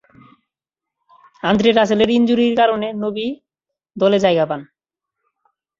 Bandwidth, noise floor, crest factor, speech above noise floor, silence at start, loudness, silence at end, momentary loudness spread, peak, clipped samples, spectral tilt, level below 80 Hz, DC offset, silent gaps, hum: 7.6 kHz; -85 dBFS; 18 dB; 70 dB; 1.45 s; -17 LUFS; 1.15 s; 12 LU; -2 dBFS; under 0.1%; -6 dB/octave; -56 dBFS; under 0.1%; none; none